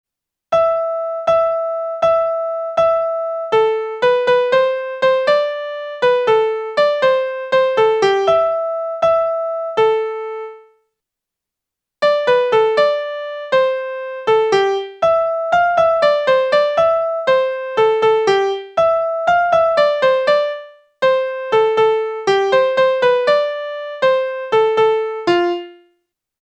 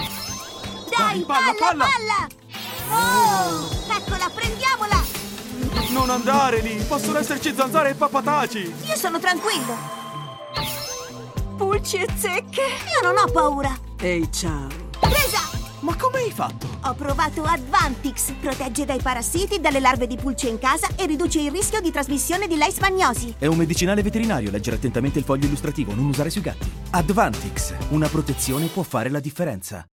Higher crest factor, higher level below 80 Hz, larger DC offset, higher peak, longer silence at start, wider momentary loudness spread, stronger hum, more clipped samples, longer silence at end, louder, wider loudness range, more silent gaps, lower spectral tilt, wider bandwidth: about the same, 14 dB vs 18 dB; second, -58 dBFS vs -34 dBFS; neither; about the same, -2 dBFS vs -4 dBFS; first, 0.5 s vs 0 s; second, 7 LU vs 10 LU; neither; neither; first, 0.7 s vs 0.1 s; first, -16 LUFS vs -22 LUFS; about the same, 3 LU vs 3 LU; neither; about the same, -4 dB/octave vs -4 dB/octave; second, 9 kHz vs 17 kHz